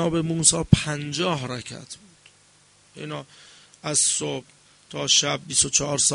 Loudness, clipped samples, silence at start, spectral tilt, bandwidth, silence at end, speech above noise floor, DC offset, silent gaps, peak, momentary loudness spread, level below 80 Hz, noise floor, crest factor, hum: -21 LUFS; under 0.1%; 0 s; -3 dB/octave; 11 kHz; 0 s; 33 dB; under 0.1%; none; 0 dBFS; 19 LU; -46 dBFS; -57 dBFS; 24 dB; none